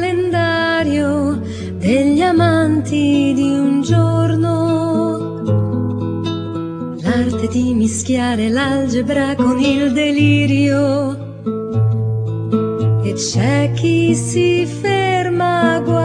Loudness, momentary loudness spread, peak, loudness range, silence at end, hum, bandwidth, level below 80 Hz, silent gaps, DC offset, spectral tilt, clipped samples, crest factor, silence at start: -16 LUFS; 7 LU; -2 dBFS; 3 LU; 0 s; none; 10.5 kHz; -46 dBFS; none; under 0.1%; -6 dB/octave; under 0.1%; 14 dB; 0 s